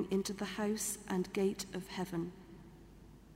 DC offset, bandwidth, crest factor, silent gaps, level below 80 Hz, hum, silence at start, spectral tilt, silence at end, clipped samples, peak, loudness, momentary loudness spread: under 0.1%; 16 kHz; 16 dB; none; -62 dBFS; none; 0 s; -4.5 dB/octave; 0 s; under 0.1%; -22 dBFS; -38 LUFS; 22 LU